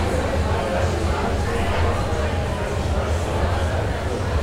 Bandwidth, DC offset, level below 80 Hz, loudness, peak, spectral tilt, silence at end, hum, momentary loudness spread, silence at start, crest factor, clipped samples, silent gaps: 13.5 kHz; under 0.1%; -28 dBFS; -23 LUFS; -8 dBFS; -6 dB/octave; 0 s; none; 2 LU; 0 s; 14 dB; under 0.1%; none